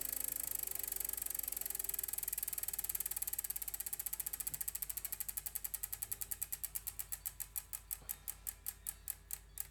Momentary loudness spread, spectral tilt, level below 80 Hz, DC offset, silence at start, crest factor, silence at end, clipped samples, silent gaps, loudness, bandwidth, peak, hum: 6 LU; 0 dB/octave; -62 dBFS; under 0.1%; 0 s; 26 dB; 0 s; under 0.1%; none; -40 LUFS; over 20 kHz; -18 dBFS; none